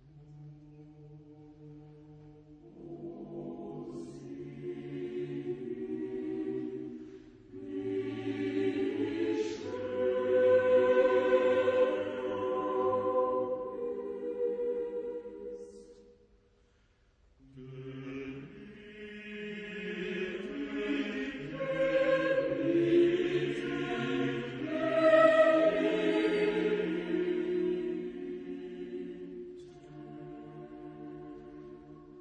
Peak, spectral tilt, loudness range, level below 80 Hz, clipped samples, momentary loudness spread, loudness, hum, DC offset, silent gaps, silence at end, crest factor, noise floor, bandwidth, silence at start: -12 dBFS; -6.5 dB/octave; 19 LU; -66 dBFS; under 0.1%; 22 LU; -31 LUFS; none; under 0.1%; none; 0 s; 20 dB; -68 dBFS; 9 kHz; 0.05 s